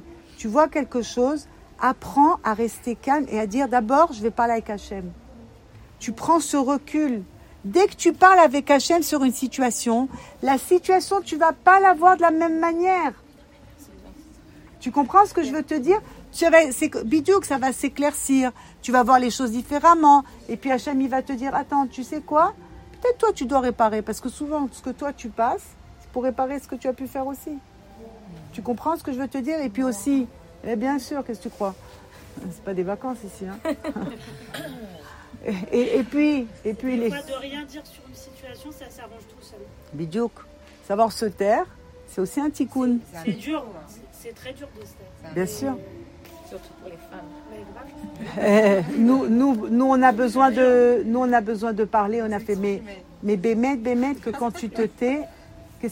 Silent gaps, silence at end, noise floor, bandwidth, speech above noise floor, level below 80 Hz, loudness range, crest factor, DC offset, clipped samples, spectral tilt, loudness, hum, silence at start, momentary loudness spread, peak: none; 0 s; -49 dBFS; 16.5 kHz; 27 dB; -52 dBFS; 13 LU; 20 dB; under 0.1%; under 0.1%; -4.5 dB/octave; -22 LUFS; none; 0.05 s; 21 LU; -2 dBFS